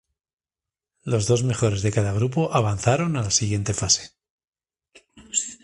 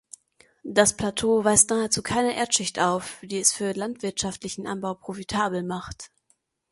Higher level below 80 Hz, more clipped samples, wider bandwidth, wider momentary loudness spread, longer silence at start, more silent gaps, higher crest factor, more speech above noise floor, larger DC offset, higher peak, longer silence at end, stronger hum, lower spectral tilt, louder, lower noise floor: first, -46 dBFS vs -54 dBFS; neither; about the same, 11.5 kHz vs 12 kHz; second, 5 LU vs 14 LU; first, 1.05 s vs 0.65 s; first, 4.30-4.38 s, 4.48-4.53 s vs none; about the same, 20 dB vs 24 dB; first, over 68 dB vs 44 dB; neither; about the same, -4 dBFS vs -2 dBFS; second, 0.1 s vs 0.65 s; neither; first, -4.5 dB/octave vs -2.5 dB/octave; about the same, -22 LUFS vs -24 LUFS; first, under -90 dBFS vs -69 dBFS